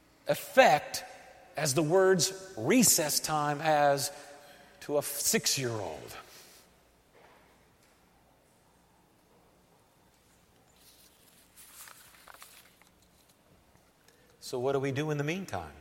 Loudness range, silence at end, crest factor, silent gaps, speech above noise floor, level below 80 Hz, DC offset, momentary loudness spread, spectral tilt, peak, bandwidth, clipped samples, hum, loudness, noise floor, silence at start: 14 LU; 0 s; 26 dB; none; 36 dB; -68 dBFS; under 0.1%; 26 LU; -3 dB/octave; -6 dBFS; 16.5 kHz; under 0.1%; none; -28 LUFS; -65 dBFS; 0.25 s